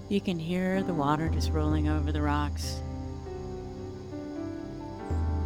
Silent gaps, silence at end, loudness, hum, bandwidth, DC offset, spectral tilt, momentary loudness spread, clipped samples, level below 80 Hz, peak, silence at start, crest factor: none; 0 s; -31 LUFS; none; 14 kHz; under 0.1%; -7 dB/octave; 12 LU; under 0.1%; -40 dBFS; -14 dBFS; 0 s; 16 dB